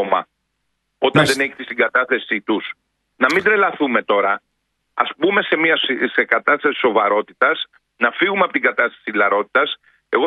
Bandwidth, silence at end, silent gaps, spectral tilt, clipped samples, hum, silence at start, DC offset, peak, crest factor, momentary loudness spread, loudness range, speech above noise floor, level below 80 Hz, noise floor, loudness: 12 kHz; 0 s; none; -4.5 dB/octave; under 0.1%; none; 0 s; under 0.1%; 0 dBFS; 18 dB; 7 LU; 2 LU; 54 dB; -62 dBFS; -72 dBFS; -17 LUFS